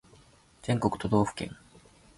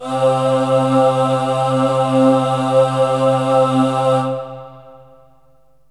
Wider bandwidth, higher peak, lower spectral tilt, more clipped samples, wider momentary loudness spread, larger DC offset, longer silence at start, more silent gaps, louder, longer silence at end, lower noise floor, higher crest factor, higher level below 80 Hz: about the same, 11.5 kHz vs 11.5 kHz; second, -10 dBFS vs -2 dBFS; about the same, -6.5 dB/octave vs -7 dB/octave; neither; first, 14 LU vs 4 LU; second, under 0.1% vs 0.3%; first, 0.65 s vs 0 s; neither; second, -29 LUFS vs -15 LUFS; second, 0.65 s vs 0.95 s; about the same, -58 dBFS vs -56 dBFS; first, 22 dB vs 14 dB; first, -54 dBFS vs -64 dBFS